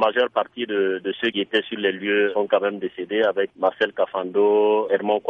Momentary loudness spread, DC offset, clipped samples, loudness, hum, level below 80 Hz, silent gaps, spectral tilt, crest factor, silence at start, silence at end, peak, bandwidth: 6 LU; under 0.1%; under 0.1%; -22 LUFS; none; -70 dBFS; none; -6.5 dB/octave; 16 dB; 0 s; 0 s; -6 dBFS; 4.8 kHz